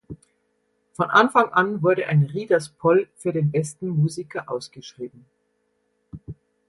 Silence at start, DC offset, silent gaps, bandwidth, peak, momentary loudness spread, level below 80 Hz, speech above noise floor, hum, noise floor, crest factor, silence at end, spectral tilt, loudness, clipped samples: 0.1 s; under 0.1%; none; 11.5 kHz; -2 dBFS; 21 LU; -60 dBFS; 49 dB; none; -71 dBFS; 22 dB; 0.35 s; -6.5 dB/octave; -21 LUFS; under 0.1%